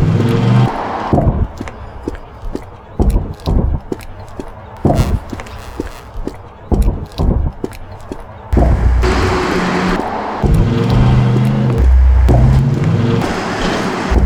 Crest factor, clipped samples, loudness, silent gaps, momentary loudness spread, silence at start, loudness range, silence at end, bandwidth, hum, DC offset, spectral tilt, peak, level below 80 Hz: 14 dB; under 0.1%; -14 LUFS; none; 17 LU; 0 s; 9 LU; 0 s; 12 kHz; none; under 0.1%; -7.5 dB/octave; 0 dBFS; -18 dBFS